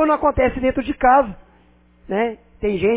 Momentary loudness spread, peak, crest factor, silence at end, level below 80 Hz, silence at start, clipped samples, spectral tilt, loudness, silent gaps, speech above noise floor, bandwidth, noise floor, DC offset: 11 LU; -4 dBFS; 16 dB; 0 s; -38 dBFS; 0 s; under 0.1%; -10 dB/octave; -19 LUFS; none; 35 dB; 4 kHz; -53 dBFS; under 0.1%